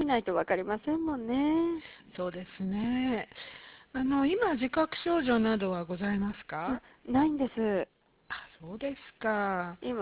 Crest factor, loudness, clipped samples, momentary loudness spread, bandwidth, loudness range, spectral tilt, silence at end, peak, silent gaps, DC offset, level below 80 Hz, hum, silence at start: 18 dB; -31 LUFS; under 0.1%; 14 LU; 4 kHz; 3 LU; -4.5 dB/octave; 0 s; -14 dBFS; none; under 0.1%; -58 dBFS; none; 0 s